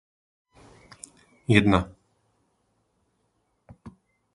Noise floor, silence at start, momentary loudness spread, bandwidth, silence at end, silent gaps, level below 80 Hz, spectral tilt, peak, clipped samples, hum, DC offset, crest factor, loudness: -72 dBFS; 1.5 s; 26 LU; 11.5 kHz; 0.45 s; none; -48 dBFS; -6.5 dB/octave; -2 dBFS; under 0.1%; none; under 0.1%; 28 dB; -22 LUFS